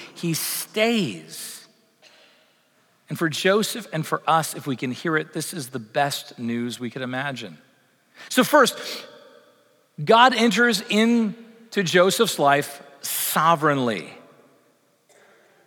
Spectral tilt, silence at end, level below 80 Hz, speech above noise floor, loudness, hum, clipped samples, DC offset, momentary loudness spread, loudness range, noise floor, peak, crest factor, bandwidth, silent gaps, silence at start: -3.5 dB/octave; 1.45 s; -82 dBFS; 41 dB; -22 LUFS; none; under 0.1%; under 0.1%; 16 LU; 8 LU; -62 dBFS; -2 dBFS; 20 dB; over 20 kHz; none; 0 s